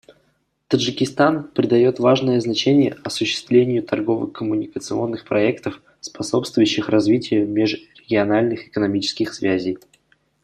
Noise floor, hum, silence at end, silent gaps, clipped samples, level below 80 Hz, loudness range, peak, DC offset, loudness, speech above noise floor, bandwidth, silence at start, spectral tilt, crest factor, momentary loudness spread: -65 dBFS; none; 0.65 s; none; under 0.1%; -60 dBFS; 4 LU; -2 dBFS; under 0.1%; -19 LUFS; 46 dB; 13 kHz; 0.7 s; -5.5 dB/octave; 18 dB; 8 LU